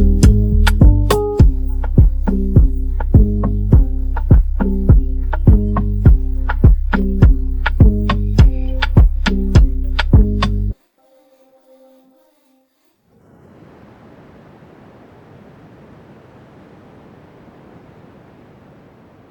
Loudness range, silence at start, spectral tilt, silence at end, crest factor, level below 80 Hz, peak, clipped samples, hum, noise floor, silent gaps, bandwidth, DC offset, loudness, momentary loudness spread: 5 LU; 0 s; -7.5 dB/octave; 8.55 s; 14 dB; -16 dBFS; 0 dBFS; under 0.1%; none; -60 dBFS; none; 13 kHz; under 0.1%; -15 LUFS; 8 LU